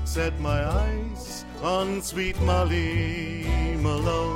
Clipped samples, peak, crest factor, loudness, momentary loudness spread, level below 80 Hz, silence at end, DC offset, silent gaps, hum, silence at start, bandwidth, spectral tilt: under 0.1%; -10 dBFS; 14 dB; -26 LUFS; 8 LU; -30 dBFS; 0 s; under 0.1%; none; none; 0 s; 16.5 kHz; -5.5 dB/octave